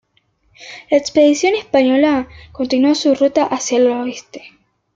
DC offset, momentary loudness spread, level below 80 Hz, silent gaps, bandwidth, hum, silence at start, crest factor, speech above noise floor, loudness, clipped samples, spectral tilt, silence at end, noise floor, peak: under 0.1%; 19 LU; -54 dBFS; none; 7.8 kHz; none; 0.6 s; 14 dB; 45 dB; -15 LUFS; under 0.1%; -3 dB/octave; 0.5 s; -60 dBFS; -2 dBFS